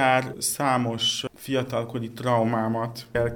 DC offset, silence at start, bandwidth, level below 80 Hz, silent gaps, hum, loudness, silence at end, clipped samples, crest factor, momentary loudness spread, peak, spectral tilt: under 0.1%; 0 s; over 20 kHz; -54 dBFS; none; none; -25 LUFS; 0 s; under 0.1%; 20 dB; 7 LU; -6 dBFS; -4 dB/octave